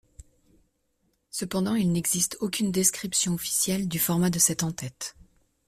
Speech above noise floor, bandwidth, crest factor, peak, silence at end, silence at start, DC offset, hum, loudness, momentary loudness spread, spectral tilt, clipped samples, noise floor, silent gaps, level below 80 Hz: 46 dB; 16 kHz; 20 dB; -8 dBFS; 0.55 s; 1.35 s; under 0.1%; none; -25 LUFS; 12 LU; -3.5 dB/octave; under 0.1%; -72 dBFS; none; -58 dBFS